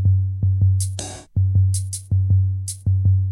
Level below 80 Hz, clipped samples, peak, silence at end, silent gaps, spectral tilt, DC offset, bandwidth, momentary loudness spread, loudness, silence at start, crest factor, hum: -40 dBFS; under 0.1%; -8 dBFS; 0 s; none; -6 dB/octave; under 0.1%; 12 kHz; 7 LU; -20 LUFS; 0 s; 10 dB; none